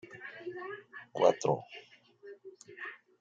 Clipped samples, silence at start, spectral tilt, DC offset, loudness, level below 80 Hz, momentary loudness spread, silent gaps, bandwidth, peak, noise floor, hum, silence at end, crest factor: under 0.1%; 0.05 s; -5 dB/octave; under 0.1%; -34 LUFS; -82 dBFS; 24 LU; none; 9 kHz; -12 dBFS; -54 dBFS; none; 0.25 s; 24 dB